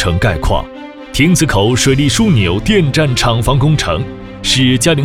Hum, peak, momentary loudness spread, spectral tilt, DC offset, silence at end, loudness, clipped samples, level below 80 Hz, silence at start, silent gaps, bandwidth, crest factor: none; 0 dBFS; 9 LU; -4.5 dB/octave; 0.6%; 0 s; -12 LUFS; under 0.1%; -26 dBFS; 0 s; none; 17 kHz; 12 dB